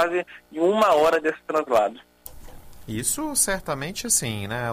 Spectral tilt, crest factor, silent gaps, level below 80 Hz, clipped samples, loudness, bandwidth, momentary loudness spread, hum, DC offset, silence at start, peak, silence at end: -3 dB/octave; 16 dB; none; -48 dBFS; under 0.1%; -22 LUFS; 15.5 kHz; 12 LU; none; under 0.1%; 0 s; -8 dBFS; 0 s